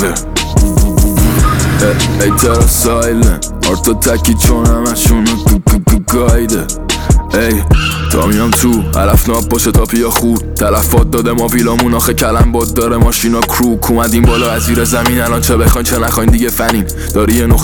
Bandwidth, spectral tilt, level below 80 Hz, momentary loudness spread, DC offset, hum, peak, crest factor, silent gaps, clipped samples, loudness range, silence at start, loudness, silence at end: over 20 kHz; -5 dB/octave; -14 dBFS; 3 LU; 0.4%; none; 0 dBFS; 10 dB; none; under 0.1%; 1 LU; 0 s; -11 LUFS; 0 s